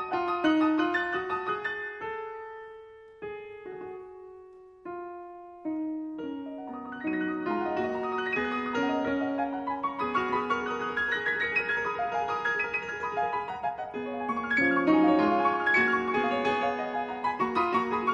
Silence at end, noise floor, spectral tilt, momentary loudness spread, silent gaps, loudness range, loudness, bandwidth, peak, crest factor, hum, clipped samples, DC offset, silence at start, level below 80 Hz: 0 s; -50 dBFS; -5.5 dB/octave; 18 LU; none; 14 LU; -28 LUFS; 7.6 kHz; -12 dBFS; 18 dB; none; under 0.1%; under 0.1%; 0 s; -62 dBFS